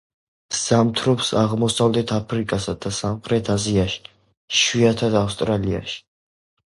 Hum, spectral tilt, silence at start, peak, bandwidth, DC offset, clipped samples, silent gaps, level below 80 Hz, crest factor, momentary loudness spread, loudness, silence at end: none; -4.5 dB/octave; 0.5 s; -4 dBFS; 11.5 kHz; under 0.1%; under 0.1%; 4.37-4.48 s; -44 dBFS; 18 dB; 8 LU; -20 LUFS; 0.75 s